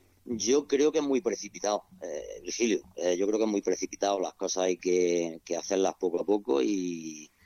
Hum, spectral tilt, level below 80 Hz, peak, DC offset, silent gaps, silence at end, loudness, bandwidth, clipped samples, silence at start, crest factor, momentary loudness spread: none; -3.5 dB/octave; -68 dBFS; -14 dBFS; under 0.1%; none; 0.2 s; -29 LUFS; 13.5 kHz; under 0.1%; 0.25 s; 14 dB; 11 LU